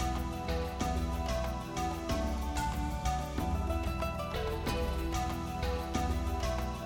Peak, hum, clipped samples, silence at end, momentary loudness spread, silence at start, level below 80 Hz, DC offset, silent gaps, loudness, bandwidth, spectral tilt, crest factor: -20 dBFS; none; under 0.1%; 0 s; 2 LU; 0 s; -38 dBFS; under 0.1%; none; -35 LUFS; 17.5 kHz; -5.5 dB/octave; 14 dB